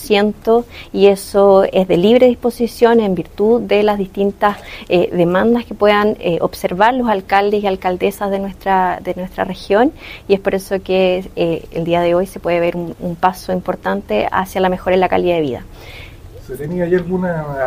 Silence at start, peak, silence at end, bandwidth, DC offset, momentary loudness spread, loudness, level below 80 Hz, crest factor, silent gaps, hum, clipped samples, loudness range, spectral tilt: 0 s; 0 dBFS; 0 s; 16 kHz; under 0.1%; 10 LU; -15 LUFS; -40 dBFS; 16 dB; none; none; under 0.1%; 5 LU; -6.5 dB/octave